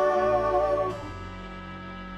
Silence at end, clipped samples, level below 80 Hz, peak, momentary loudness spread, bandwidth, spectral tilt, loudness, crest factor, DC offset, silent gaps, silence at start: 0 s; under 0.1%; -46 dBFS; -14 dBFS; 16 LU; 10.5 kHz; -6.5 dB/octave; -25 LUFS; 14 dB; under 0.1%; none; 0 s